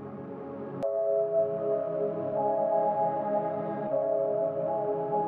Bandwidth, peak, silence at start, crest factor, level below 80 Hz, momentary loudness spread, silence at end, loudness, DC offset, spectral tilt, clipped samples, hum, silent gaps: 3.8 kHz; -16 dBFS; 0 s; 12 dB; -78 dBFS; 8 LU; 0 s; -29 LUFS; under 0.1%; -10.5 dB/octave; under 0.1%; none; none